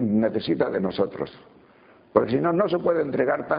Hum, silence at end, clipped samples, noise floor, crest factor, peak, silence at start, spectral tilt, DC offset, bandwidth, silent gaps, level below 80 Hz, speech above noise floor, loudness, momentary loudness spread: none; 0 s; under 0.1%; -54 dBFS; 22 dB; -2 dBFS; 0 s; -5.5 dB/octave; under 0.1%; 5.2 kHz; none; -60 dBFS; 30 dB; -24 LUFS; 5 LU